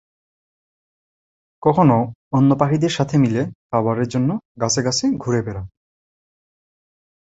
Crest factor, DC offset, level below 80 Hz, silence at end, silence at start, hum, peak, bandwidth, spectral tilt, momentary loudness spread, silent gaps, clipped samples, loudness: 20 dB; under 0.1%; -52 dBFS; 1.55 s; 1.65 s; none; -2 dBFS; 8 kHz; -6 dB/octave; 8 LU; 2.15-2.31 s, 3.55-3.70 s, 4.45-4.55 s; under 0.1%; -19 LUFS